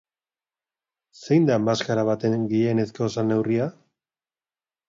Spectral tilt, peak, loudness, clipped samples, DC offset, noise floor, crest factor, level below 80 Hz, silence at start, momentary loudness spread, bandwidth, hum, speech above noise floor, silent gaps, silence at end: -7 dB/octave; -6 dBFS; -23 LUFS; under 0.1%; under 0.1%; under -90 dBFS; 18 dB; -64 dBFS; 1.2 s; 6 LU; 7.6 kHz; none; over 68 dB; none; 1.15 s